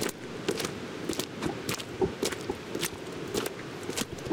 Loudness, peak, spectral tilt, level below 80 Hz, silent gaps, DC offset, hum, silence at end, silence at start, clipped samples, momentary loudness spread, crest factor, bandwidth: -34 LUFS; -14 dBFS; -3.5 dB/octave; -56 dBFS; none; under 0.1%; none; 0 s; 0 s; under 0.1%; 5 LU; 20 dB; 18 kHz